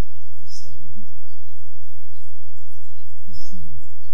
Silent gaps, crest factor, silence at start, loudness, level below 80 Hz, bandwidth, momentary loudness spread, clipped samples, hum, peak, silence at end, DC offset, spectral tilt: none; 16 dB; 0 s; -44 LUFS; -48 dBFS; over 20 kHz; 5 LU; under 0.1%; none; -4 dBFS; 0 s; 40%; -6 dB/octave